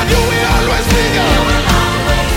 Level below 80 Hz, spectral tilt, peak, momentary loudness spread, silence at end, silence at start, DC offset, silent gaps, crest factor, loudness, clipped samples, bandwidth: -18 dBFS; -4.5 dB/octave; 0 dBFS; 1 LU; 0 s; 0 s; under 0.1%; none; 12 dB; -12 LUFS; under 0.1%; 17 kHz